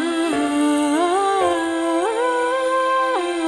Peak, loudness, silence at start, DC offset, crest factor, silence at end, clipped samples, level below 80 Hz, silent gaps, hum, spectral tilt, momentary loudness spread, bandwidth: -8 dBFS; -19 LUFS; 0 s; under 0.1%; 10 dB; 0 s; under 0.1%; -60 dBFS; none; none; -3 dB/octave; 2 LU; 12 kHz